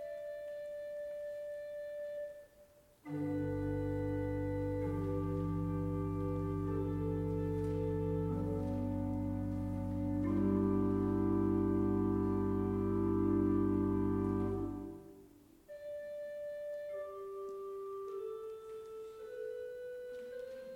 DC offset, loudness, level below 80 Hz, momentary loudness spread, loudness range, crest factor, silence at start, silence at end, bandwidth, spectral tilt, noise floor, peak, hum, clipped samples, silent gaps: under 0.1%; -37 LUFS; -52 dBFS; 13 LU; 11 LU; 16 dB; 0 s; 0 s; 14 kHz; -10 dB/octave; -64 dBFS; -22 dBFS; none; under 0.1%; none